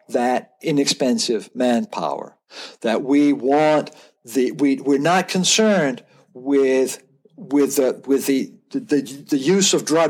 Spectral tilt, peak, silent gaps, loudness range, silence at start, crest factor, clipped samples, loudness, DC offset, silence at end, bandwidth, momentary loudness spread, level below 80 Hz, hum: -4 dB/octave; -4 dBFS; none; 3 LU; 0.1 s; 16 dB; under 0.1%; -19 LUFS; under 0.1%; 0 s; 18 kHz; 12 LU; -80 dBFS; none